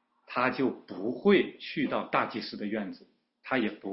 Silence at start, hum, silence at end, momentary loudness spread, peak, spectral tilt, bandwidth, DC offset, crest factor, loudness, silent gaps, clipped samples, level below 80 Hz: 0.3 s; none; 0 s; 12 LU; -10 dBFS; -9.5 dB/octave; 5.8 kHz; under 0.1%; 20 dB; -30 LUFS; none; under 0.1%; -70 dBFS